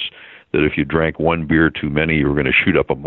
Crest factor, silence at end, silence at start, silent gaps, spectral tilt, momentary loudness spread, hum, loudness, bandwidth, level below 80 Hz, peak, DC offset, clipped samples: 16 dB; 0 s; 0 s; none; -4.5 dB/octave; 5 LU; none; -17 LUFS; 4.2 kHz; -38 dBFS; -2 dBFS; under 0.1%; under 0.1%